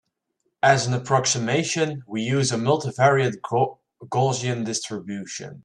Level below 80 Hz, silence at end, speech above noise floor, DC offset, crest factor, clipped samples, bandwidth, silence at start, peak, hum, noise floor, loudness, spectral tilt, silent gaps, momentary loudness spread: -62 dBFS; 0.05 s; 52 dB; under 0.1%; 20 dB; under 0.1%; 11 kHz; 0.65 s; -2 dBFS; none; -75 dBFS; -23 LUFS; -4.5 dB/octave; none; 10 LU